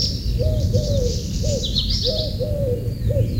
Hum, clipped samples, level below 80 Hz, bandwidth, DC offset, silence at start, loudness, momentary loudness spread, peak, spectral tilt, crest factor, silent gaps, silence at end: none; under 0.1%; -26 dBFS; 16 kHz; under 0.1%; 0 s; -22 LUFS; 4 LU; -6 dBFS; -5.5 dB/octave; 14 dB; none; 0 s